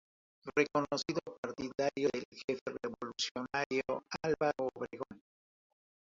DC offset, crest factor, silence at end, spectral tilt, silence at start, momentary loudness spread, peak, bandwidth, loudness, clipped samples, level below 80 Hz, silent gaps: under 0.1%; 22 dB; 0.95 s; -3 dB/octave; 0.45 s; 10 LU; -16 dBFS; 7.6 kHz; -37 LUFS; under 0.1%; -72 dBFS; 1.38-1.43 s, 2.25-2.32 s, 2.44-2.48 s, 2.61-2.66 s, 3.31-3.35 s, 3.66-3.70 s